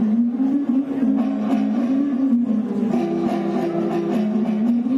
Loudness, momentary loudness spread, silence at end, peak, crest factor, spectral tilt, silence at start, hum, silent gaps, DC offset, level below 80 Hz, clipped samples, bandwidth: -20 LUFS; 2 LU; 0 s; -10 dBFS; 10 dB; -8.5 dB/octave; 0 s; none; none; under 0.1%; -62 dBFS; under 0.1%; 7.2 kHz